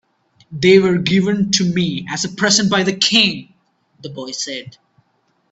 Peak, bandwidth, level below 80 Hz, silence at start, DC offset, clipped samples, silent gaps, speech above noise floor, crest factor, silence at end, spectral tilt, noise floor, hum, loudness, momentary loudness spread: 0 dBFS; 8.2 kHz; -54 dBFS; 0.5 s; under 0.1%; under 0.1%; none; 47 dB; 18 dB; 0.8 s; -3.5 dB/octave; -63 dBFS; none; -15 LUFS; 18 LU